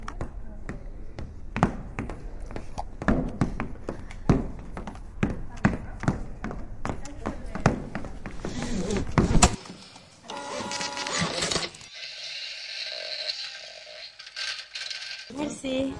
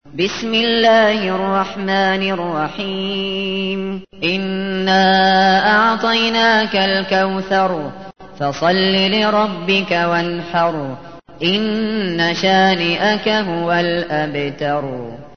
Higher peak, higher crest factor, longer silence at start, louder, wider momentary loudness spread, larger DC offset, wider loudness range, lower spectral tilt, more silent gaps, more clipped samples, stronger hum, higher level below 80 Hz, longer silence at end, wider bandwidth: about the same, 0 dBFS vs -2 dBFS; first, 28 dB vs 16 dB; about the same, 0 s vs 0.05 s; second, -30 LUFS vs -16 LUFS; first, 15 LU vs 9 LU; second, under 0.1% vs 0.7%; about the same, 6 LU vs 4 LU; about the same, -4.5 dB/octave vs -5 dB/octave; neither; neither; neither; first, -38 dBFS vs -52 dBFS; about the same, 0 s vs 0.1 s; first, 11.5 kHz vs 6.6 kHz